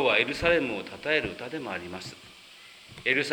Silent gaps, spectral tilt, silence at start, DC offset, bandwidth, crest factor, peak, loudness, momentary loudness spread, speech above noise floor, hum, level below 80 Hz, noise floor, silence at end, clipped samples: none; -4 dB/octave; 0 s; under 0.1%; 19.5 kHz; 22 dB; -8 dBFS; -27 LUFS; 24 LU; 22 dB; none; -54 dBFS; -50 dBFS; 0 s; under 0.1%